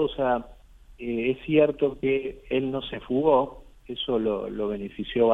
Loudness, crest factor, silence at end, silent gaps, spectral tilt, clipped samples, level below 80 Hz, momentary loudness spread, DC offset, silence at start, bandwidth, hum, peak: -26 LUFS; 18 dB; 0 s; none; -8 dB/octave; under 0.1%; -50 dBFS; 11 LU; under 0.1%; 0 s; 4 kHz; none; -6 dBFS